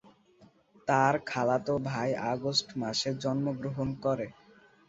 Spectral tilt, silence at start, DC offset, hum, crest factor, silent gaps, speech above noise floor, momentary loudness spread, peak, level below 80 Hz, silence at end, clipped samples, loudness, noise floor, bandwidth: -5 dB/octave; 0.4 s; under 0.1%; none; 20 dB; none; 31 dB; 8 LU; -10 dBFS; -64 dBFS; 0.55 s; under 0.1%; -30 LUFS; -61 dBFS; 8 kHz